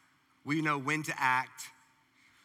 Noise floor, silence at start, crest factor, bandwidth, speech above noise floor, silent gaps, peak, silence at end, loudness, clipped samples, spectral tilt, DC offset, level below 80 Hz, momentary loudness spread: -66 dBFS; 0.45 s; 20 dB; 17 kHz; 34 dB; none; -14 dBFS; 0.75 s; -31 LUFS; under 0.1%; -4.5 dB/octave; under 0.1%; -88 dBFS; 18 LU